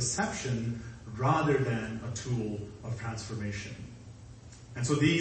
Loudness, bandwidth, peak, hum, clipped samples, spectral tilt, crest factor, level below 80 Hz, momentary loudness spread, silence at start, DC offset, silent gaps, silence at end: -32 LUFS; 8.8 kHz; -12 dBFS; none; under 0.1%; -5 dB/octave; 20 dB; -54 dBFS; 20 LU; 0 s; under 0.1%; none; 0 s